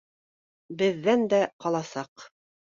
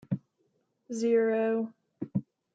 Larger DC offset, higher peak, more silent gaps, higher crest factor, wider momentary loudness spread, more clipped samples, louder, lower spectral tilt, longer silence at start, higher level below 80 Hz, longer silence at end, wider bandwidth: neither; first, -12 dBFS vs -16 dBFS; first, 1.53-1.59 s, 2.08-2.16 s vs none; about the same, 16 dB vs 16 dB; about the same, 16 LU vs 14 LU; neither; first, -26 LUFS vs -30 LUFS; second, -5.5 dB/octave vs -7 dB/octave; first, 0.7 s vs 0.1 s; first, -70 dBFS vs -76 dBFS; about the same, 0.35 s vs 0.35 s; second, 7.6 kHz vs 9 kHz